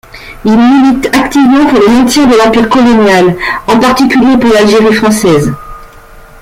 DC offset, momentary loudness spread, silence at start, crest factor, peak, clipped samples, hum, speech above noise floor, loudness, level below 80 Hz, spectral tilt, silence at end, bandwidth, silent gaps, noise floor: under 0.1%; 5 LU; 0.15 s; 6 dB; 0 dBFS; under 0.1%; none; 27 dB; -6 LUFS; -32 dBFS; -5 dB/octave; 0.2 s; 16 kHz; none; -32 dBFS